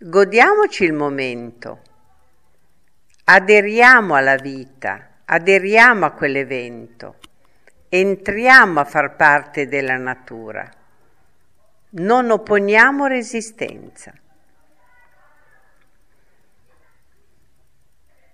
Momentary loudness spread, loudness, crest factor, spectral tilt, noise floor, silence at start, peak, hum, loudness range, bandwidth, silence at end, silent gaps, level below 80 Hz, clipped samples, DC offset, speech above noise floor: 22 LU; -14 LUFS; 18 dB; -4.5 dB/octave; -64 dBFS; 0 s; 0 dBFS; none; 7 LU; 13.5 kHz; 4.55 s; none; -58 dBFS; under 0.1%; 0.3%; 49 dB